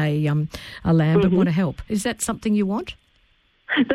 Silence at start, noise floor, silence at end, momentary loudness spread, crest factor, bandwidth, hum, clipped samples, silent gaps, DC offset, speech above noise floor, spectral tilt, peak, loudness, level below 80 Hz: 0 s; -61 dBFS; 0 s; 11 LU; 14 dB; 14.5 kHz; none; under 0.1%; none; under 0.1%; 40 dB; -6 dB/octave; -6 dBFS; -22 LUFS; -46 dBFS